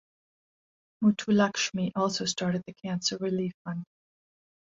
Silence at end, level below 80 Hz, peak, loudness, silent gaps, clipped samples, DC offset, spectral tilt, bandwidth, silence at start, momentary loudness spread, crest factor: 0.95 s; -70 dBFS; -12 dBFS; -29 LUFS; 3.54-3.65 s; under 0.1%; under 0.1%; -4.5 dB/octave; 7.8 kHz; 1 s; 11 LU; 18 dB